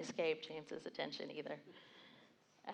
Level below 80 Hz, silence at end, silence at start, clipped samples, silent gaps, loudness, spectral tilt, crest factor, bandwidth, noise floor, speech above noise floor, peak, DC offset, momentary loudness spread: under -90 dBFS; 0 s; 0 s; under 0.1%; none; -45 LUFS; -4 dB/octave; 20 dB; 9.6 kHz; -69 dBFS; 23 dB; -26 dBFS; under 0.1%; 21 LU